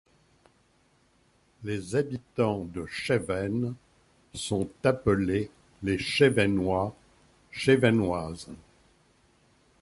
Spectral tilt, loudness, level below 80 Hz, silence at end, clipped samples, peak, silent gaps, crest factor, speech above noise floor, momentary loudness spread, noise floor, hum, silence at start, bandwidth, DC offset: -6 dB/octave; -28 LUFS; -52 dBFS; 1.25 s; under 0.1%; -8 dBFS; none; 22 dB; 39 dB; 17 LU; -66 dBFS; none; 1.6 s; 11.5 kHz; under 0.1%